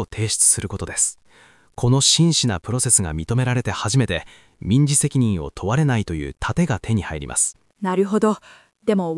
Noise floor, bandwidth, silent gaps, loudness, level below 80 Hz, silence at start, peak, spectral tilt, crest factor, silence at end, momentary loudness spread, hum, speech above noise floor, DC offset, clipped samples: -52 dBFS; 12 kHz; none; -19 LUFS; -42 dBFS; 0 s; -2 dBFS; -4 dB/octave; 18 dB; 0 s; 11 LU; none; 32 dB; under 0.1%; under 0.1%